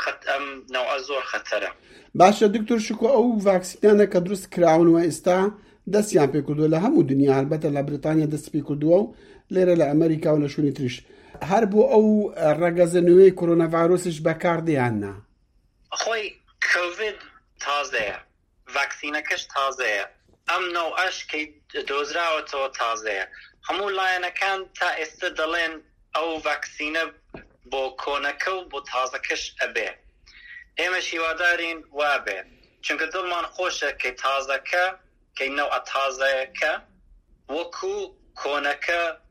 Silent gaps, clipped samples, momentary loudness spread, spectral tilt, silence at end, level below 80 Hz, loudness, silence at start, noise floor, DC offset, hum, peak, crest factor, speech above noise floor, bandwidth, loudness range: none; under 0.1%; 12 LU; -5 dB/octave; 0.15 s; -58 dBFS; -23 LUFS; 0 s; -63 dBFS; under 0.1%; none; -2 dBFS; 20 dB; 40 dB; 15 kHz; 8 LU